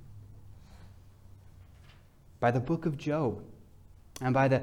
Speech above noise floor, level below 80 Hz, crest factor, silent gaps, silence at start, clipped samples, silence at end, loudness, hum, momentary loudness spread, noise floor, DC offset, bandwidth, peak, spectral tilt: 28 dB; -58 dBFS; 20 dB; none; 0 s; under 0.1%; 0 s; -31 LUFS; none; 26 LU; -56 dBFS; under 0.1%; 12.5 kHz; -12 dBFS; -7.5 dB/octave